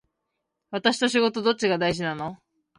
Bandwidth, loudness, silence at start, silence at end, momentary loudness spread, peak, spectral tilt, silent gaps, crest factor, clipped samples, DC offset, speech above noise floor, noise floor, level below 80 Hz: 11.5 kHz; -24 LUFS; 0.7 s; 0.45 s; 12 LU; -6 dBFS; -4 dB/octave; none; 20 dB; under 0.1%; under 0.1%; 57 dB; -80 dBFS; -60 dBFS